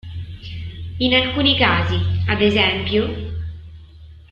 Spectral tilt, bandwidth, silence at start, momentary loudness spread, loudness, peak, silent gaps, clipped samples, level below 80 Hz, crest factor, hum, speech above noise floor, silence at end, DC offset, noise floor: -7 dB/octave; 7 kHz; 0.05 s; 17 LU; -17 LUFS; -2 dBFS; none; under 0.1%; -38 dBFS; 18 dB; none; 24 dB; 0.1 s; under 0.1%; -41 dBFS